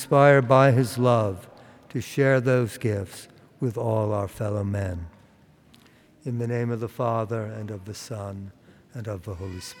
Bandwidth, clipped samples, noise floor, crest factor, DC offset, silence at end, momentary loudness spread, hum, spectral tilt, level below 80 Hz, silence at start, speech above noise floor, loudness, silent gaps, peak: 17.5 kHz; under 0.1%; -56 dBFS; 20 dB; under 0.1%; 0.05 s; 20 LU; none; -7 dB/octave; -60 dBFS; 0 s; 32 dB; -24 LUFS; none; -4 dBFS